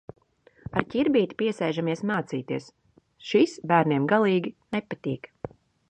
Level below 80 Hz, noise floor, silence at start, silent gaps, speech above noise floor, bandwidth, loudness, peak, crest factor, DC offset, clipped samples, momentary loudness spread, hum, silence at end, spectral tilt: -60 dBFS; -60 dBFS; 0.75 s; none; 34 dB; 9.2 kHz; -26 LUFS; -2 dBFS; 24 dB; under 0.1%; under 0.1%; 15 LU; none; 0.45 s; -6.5 dB/octave